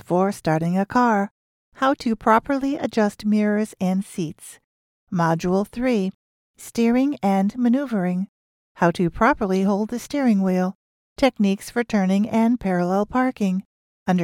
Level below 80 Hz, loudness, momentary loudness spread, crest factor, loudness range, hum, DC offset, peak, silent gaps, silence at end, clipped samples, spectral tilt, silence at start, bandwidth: -50 dBFS; -22 LUFS; 10 LU; 18 dB; 2 LU; none; under 0.1%; -4 dBFS; 1.31-1.72 s, 4.64-5.07 s, 6.14-6.54 s, 8.29-8.75 s, 10.75-11.16 s, 13.65-14.06 s; 0 s; under 0.1%; -7 dB/octave; 0.1 s; 15.5 kHz